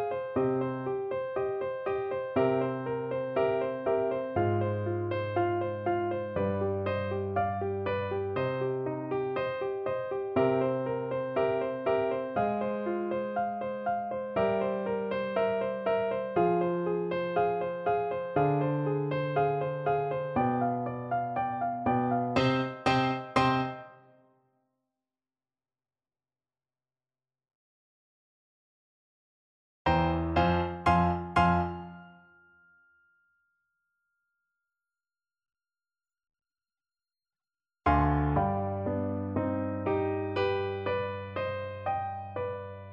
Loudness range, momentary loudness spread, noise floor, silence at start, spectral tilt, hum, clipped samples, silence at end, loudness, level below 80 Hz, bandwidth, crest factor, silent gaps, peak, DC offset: 4 LU; 6 LU; under -90 dBFS; 0 s; -8 dB/octave; none; under 0.1%; 0 s; -30 LUFS; -50 dBFS; 9.4 kHz; 20 dB; 27.55-29.85 s; -10 dBFS; under 0.1%